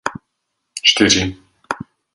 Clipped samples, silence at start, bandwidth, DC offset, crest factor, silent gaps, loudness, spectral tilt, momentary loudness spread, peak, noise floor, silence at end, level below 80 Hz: under 0.1%; 0.05 s; 11.5 kHz; under 0.1%; 20 dB; none; -14 LUFS; -2 dB/octave; 16 LU; 0 dBFS; -74 dBFS; 0.35 s; -44 dBFS